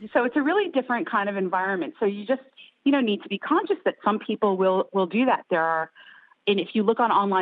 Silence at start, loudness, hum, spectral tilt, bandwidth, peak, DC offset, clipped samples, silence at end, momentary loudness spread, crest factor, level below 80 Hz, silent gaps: 0 s; -24 LUFS; none; -9.5 dB/octave; 4.8 kHz; -8 dBFS; under 0.1%; under 0.1%; 0 s; 6 LU; 16 dB; -74 dBFS; none